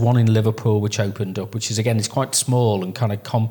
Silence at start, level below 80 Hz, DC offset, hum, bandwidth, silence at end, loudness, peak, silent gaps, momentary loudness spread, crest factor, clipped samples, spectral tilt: 0 s; -64 dBFS; under 0.1%; none; 19 kHz; 0 s; -20 LUFS; -4 dBFS; none; 7 LU; 14 dB; under 0.1%; -5.5 dB/octave